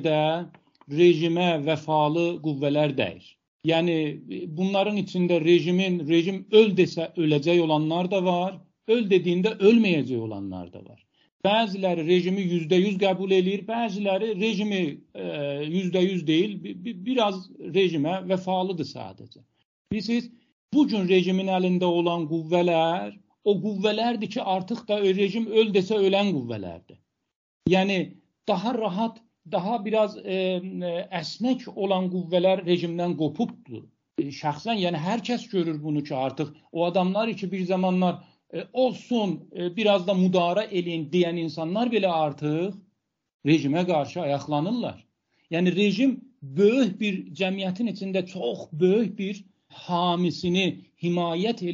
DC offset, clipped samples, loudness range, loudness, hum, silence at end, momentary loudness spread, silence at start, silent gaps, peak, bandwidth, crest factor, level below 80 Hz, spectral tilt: under 0.1%; under 0.1%; 5 LU; -25 LUFS; none; 0 s; 11 LU; 0 s; 3.48-3.60 s, 11.32-11.40 s, 19.65-19.85 s, 20.52-20.68 s, 27.36-27.60 s, 43.34-43.39 s; -4 dBFS; 7.4 kHz; 20 dB; -68 dBFS; -5 dB/octave